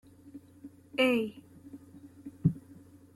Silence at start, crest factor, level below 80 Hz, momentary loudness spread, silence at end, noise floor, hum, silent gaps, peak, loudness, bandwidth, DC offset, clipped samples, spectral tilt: 0.25 s; 22 dB; -66 dBFS; 25 LU; 0.55 s; -55 dBFS; none; none; -12 dBFS; -31 LUFS; 13.5 kHz; under 0.1%; under 0.1%; -6.5 dB/octave